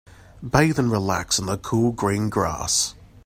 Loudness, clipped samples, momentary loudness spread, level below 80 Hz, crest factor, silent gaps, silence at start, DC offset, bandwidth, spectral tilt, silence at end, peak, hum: -22 LUFS; under 0.1%; 5 LU; -44 dBFS; 20 dB; none; 0.35 s; under 0.1%; 16 kHz; -4 dB/octave; 0.2 s; -2 dBFS; none